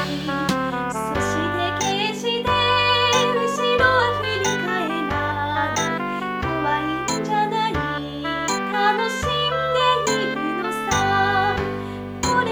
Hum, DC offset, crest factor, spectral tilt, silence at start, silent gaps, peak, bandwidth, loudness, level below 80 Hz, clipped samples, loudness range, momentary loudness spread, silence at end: none; under 0.1%; 16 dB; -3.5 dB/octave; 0 s; none; -6 dBFS; over 20 kHz; -21 LUFS; -42 dBFS; under 0.1%; 4 LU; 8 LU; 0 s